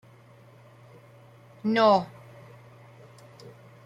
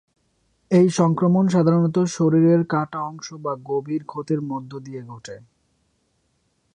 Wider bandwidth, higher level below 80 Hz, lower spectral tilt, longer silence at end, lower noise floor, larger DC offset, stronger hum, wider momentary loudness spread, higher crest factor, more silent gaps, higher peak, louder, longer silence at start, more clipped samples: first, 11.5 kHz vs 10 kHz; second, -72 dBFS vs -62 dBFS; about the same, -6.5 dB/octave vs -7.5 dB/octave; second, 0.35 s vs 1.35 s; second, -53 dBFS vs -68 dBFS; neither; neither; first, 29 LU vs 18 LU; first, 22 dB vs 16 dB; neither; second, -10 dBFS vs -6 dBFS; second, -23 LUFS vs -20 LUFS; first, 1.65 s vs 0.7 s; neither